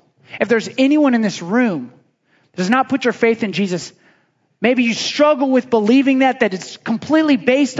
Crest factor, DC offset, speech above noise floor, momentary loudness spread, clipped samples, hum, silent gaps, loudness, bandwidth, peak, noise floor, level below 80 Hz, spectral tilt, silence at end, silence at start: 16 dB; under 0.1%; 44 dB; 11 LU; under 0.1%; none; none; -16 LUFS; 7.8 kHz; 0 dBFS; -59 dBFS; -66 dBFS; -5 dB/octave; 0 s; 0.3 s